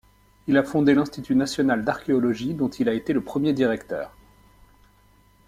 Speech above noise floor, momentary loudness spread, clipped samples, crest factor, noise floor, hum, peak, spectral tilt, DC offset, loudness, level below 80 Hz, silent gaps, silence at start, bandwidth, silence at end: 35 dB; 10 LU; under 0.1%; 18 dB; -57 dBFS; 50 Hz at -50 dBFS; -6 dBFS; -6.5 dB/octave; under 0.1%; -23 LUFS; -56 dBFS; none; 0.45 s; 14 kHz; 1.4 s